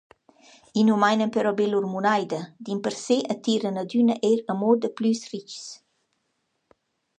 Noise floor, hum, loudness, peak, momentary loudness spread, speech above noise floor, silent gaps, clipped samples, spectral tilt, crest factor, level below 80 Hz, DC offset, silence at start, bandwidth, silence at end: -75 dBFS; none; -24 LUFS; -6 dBFS; 12 LU; 51 dB; none; under 0.1%; -5.5 dB/octave; 18 dB; -76 dBFS; under 0.1%; 0.75 s; 9.4 kHz; 1.45 s